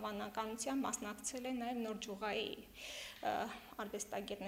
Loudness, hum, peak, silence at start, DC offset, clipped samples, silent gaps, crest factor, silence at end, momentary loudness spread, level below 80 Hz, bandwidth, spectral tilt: -43 LUFS; none; -24 dBFS; 0 s; under 0.1%; under 0.1%; none; 18 dB; 0 s; 7 LU; -70 dBFS; 16 kHz; -3 dB/octave